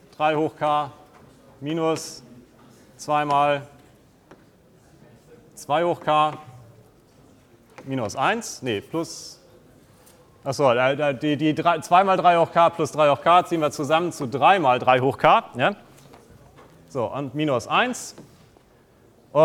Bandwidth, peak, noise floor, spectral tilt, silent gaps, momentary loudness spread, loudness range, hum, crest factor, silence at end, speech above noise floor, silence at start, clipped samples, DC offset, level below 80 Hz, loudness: 16 kHz; 0 dBFS; -55 dBFS; -5 dB/octave; none; 16 LU; 9 LU; none; 22 dB; 0 s; 34 dB; 0.2 s; under 0.1%; under 0.1%; -64 dBFS; -21 LUFS